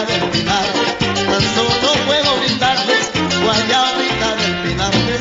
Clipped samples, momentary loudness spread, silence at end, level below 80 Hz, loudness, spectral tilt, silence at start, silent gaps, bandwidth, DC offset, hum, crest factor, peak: under 0.1%; 3 LU; 0 s; -38 dBFS; -15 LUFS; -3.5 dB/octave; 0 s; none; 8.2 kHz; under 0.1%; none; 14 dB; -2 dBFS